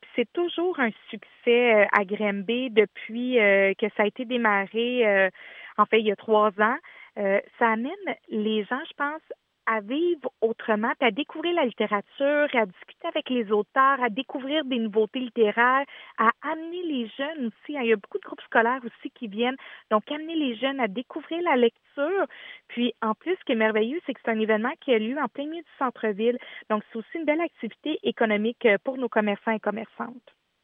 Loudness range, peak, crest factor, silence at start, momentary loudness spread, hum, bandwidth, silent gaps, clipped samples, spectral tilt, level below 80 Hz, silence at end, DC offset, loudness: 5 LU; -4 dBFS; 22 dB; 0.15 s; 11 LU; none; 3.9 kHz; none; under 0.1%; -8 dB/octave; -84 dBFS; 0.45 s; under 0.1%; -25 LUFS